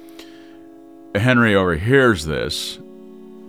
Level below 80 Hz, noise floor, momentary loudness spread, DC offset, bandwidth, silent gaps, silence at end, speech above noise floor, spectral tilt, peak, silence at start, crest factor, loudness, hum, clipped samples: -42 dBFS; -42 dBFS; 12 LU; 0.2%; 16 kHz; none; 0 s; 25 dB; -5.5 dB/octave; -2 dBFS; 0 s; 18 dB; -17 LUFS; none; under 0.1%